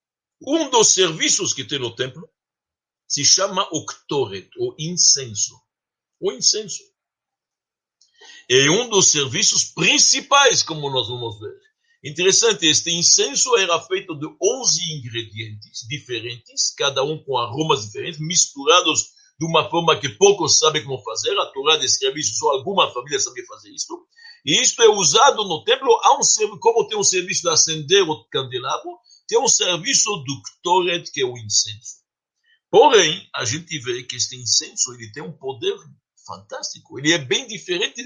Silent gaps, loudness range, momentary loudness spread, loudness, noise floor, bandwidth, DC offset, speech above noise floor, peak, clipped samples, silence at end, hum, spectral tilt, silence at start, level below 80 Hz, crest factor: none; 7 LU; 16 LU; -17 LUFS; -89 dBFS; 11 kHz; under 0.1%; 69 dB; 0 dBFS; under 0.1%; 0 s; none; -1.5 dB/octave; 0.4 s; -66 dBFS; 20 dB